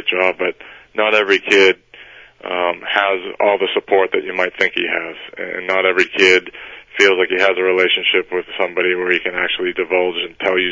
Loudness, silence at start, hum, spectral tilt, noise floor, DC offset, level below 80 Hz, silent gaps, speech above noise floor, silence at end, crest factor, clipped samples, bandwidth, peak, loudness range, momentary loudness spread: -16 LUFS; 0 s; none; -3 dB/octave; -41 dBFS; under 0.1%; -58 dBFS; none; 25 dB; 0 s; 16 dB; under 0.1%; 8 kHz; 0 dBFS; 3 LU; 12 LU